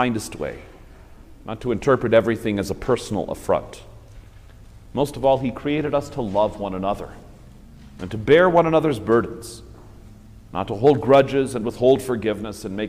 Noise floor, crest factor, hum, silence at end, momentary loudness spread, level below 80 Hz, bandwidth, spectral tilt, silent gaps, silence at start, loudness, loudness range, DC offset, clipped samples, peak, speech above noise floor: -44 dBFS; 18 dB; none; 0 s; 17 LU; -44 dBFS; 15.5 kHz; -6 dB/octave; none; 0 s; -21 LUFS; 5 LU; under 0.1%; under 0.1%; -4 dBFS; 24 dB